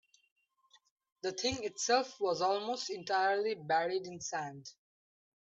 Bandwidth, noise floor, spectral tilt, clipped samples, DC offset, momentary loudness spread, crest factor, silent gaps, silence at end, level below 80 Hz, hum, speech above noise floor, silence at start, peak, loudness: 8.2 kHz; -70 dBFS; -2.5 dB/octave; under 0.1%; under 0.1%; 10 LU; 20 dB; none; 0.85 s; -72 dBFS; none; 35 dB; 1.25 s; -16 dBFS; -34 LUFS